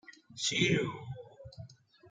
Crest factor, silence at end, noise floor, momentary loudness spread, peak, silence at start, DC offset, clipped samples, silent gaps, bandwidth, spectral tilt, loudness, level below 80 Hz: 22 dB; 0 s; -53 dBFS; 23 LU; -14 dBFS; 0.1 s; under 0.1%; under 0.1%; none; 9.6 kHz; -3.5 dB/octave; -31 LUFS; -68 dBFS